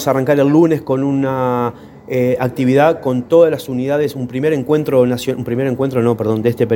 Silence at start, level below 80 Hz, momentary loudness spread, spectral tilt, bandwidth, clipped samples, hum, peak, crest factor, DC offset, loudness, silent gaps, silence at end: 0 s; -52 dBFS; 8 LU; -7.5 dB/octave; 17 kHz; under 0.1%; none; 0 dBFS; 14 dB; under 0.1%; -15 LUFS; none; 0 s